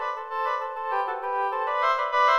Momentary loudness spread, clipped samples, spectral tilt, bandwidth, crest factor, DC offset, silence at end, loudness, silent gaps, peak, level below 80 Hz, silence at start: 6 LU; under 0.1%; -0.5 dB/octave; 13 kHz; 16 dB; under 0.1%; 0 s; -26 LUFS; none; -10 dBFS; -74 dBFS; 0 s